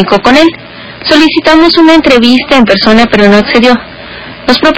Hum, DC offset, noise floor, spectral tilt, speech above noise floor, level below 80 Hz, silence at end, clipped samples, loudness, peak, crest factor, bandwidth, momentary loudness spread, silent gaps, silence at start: none; under 0.1%; -24 dBFS; -5 dB/octave; 20 dB; -32 dBFS; 0 s; 10%; -5 LUFS; 0 dBFS; 6 dB; 8 kHz; 18 LU; none; 0 s